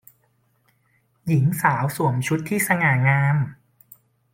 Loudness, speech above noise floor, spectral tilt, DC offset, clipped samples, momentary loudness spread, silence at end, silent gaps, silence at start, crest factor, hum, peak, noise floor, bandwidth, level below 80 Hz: -21 LUFS; 45 dB; -6 dB/octave; under 0.1%; under 0.1%; 6 LU; 0.8 s; none; 1.25 s; 18 dB; none; -4 dBFS; -65 dBFS; 16.5 kHz; -60 dBFS